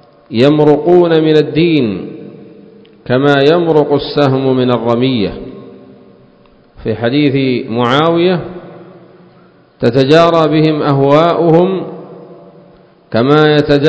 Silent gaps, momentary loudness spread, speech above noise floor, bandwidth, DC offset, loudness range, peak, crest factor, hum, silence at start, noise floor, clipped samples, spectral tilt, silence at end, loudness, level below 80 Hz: none; 13 LU; 35 dB; 8 kHz; under 0.1%; 4 LU; 0 dBFS; 12 dB; none; 0.3 s; -45 dBFS; 0.6%; -8 dB/octave; 0 s; -11 LUFS; -46 dBFS